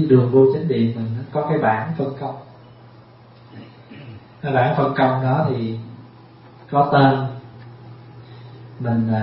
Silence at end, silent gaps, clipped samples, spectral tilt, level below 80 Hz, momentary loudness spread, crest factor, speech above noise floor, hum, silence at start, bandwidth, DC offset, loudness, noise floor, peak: 0 s; none; under 0.1%; -12.5 dB/octave; -56 dBFS; 26 LU; 18 dB; 28 dB; none; 0 s; 5.6 kHz; under 0.1%; -19 LUFS; -46 dBFS; -2 dBFS